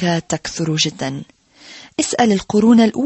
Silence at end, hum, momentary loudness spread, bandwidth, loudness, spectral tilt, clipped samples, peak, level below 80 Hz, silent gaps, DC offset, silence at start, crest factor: 0 s; none; 15 LU; 8.6 kHz; -17 LUFS; -4.5 dB/octave; under 0.1%; -2 dBFS; -50 dBFS; none; under 0.1%; 0 s; 16 dB